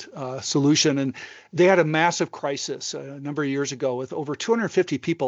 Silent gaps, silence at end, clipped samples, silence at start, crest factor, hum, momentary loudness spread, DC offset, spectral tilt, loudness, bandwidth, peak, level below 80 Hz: none; 0 s; under 0.1%; 0 s; 18 dB; none; 13 LU; under 0.1%; -4.5 dB/octave; -23 LUFS; 8.2 kHz; -4 dBFS; -74 dBFS